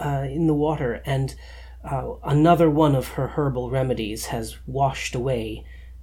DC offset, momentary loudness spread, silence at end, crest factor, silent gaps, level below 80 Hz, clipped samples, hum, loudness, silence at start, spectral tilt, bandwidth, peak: under 0.1%; 14 LU; 0 s; 18 dB; none; -40 dBFS; under 0.1%; none; -23 LUFS; 0 s; -7 dB/octave; 17 kHz; -4 dBFS